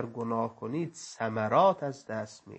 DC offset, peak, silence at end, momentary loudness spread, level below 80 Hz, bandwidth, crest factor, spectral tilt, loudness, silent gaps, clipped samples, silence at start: under 0.1%; -12 dBFS; 0 s; 14 LU; -76 dBFS; 8.6 kHz; 18 dB; -6 dB/octave; -30 LUFS; none; under 0.1%; 0 s